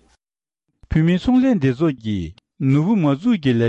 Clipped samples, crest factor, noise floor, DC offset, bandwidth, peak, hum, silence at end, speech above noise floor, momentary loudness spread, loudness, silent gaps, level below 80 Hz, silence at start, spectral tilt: under 0.1%; 12 dB; under -90 dBFS; under 0.1%; 8 kHz; -8 dBFS; none; 0 s; over 73 dB; 9 LU; -19 LUFS; none; -40 dBFS; 0.9 s; -8.5 dB/octave